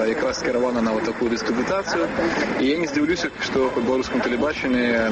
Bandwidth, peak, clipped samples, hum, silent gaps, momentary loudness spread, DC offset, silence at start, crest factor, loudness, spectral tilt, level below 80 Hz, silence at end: 8.2 kHz; -8 dBFS; under 0.1%; none; none; 2 LU; under 0.1%; 0 s; 14 dB; -22 LUFS; -4.5 dB/octave; -48 dBFS; 0 s